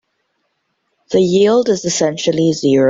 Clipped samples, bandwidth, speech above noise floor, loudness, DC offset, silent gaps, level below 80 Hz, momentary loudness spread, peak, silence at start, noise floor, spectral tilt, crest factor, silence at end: under 0.1%; 7.8 kHz; 55 dB; -14 LUFS; under 0.1%; none; -56 dBFS; 4 LU; -2 dBFS; 1.1 s; -68 dBFS; -5 dB/octave; 14 dB; 0 s